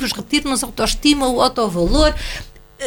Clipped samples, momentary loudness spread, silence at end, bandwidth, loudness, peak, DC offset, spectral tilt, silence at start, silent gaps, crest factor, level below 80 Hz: under 0.1%; 10 LU; 0 s; 19 kHz; -17 LUFS; 0 dBFS; under 0.1%; -3.5 dB/octave; 0 s; none; 18 dB; -26 dBFS